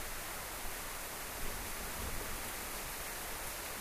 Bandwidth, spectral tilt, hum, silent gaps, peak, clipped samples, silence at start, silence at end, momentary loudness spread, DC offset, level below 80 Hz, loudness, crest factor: 15.5 kHz; -2 dB/octave; none; none; -26 dBFS; under 0.1%; 0 s; 0 s; 1 LU; under 0.1%; -48 dBFS; -41 LUFS; 14 dB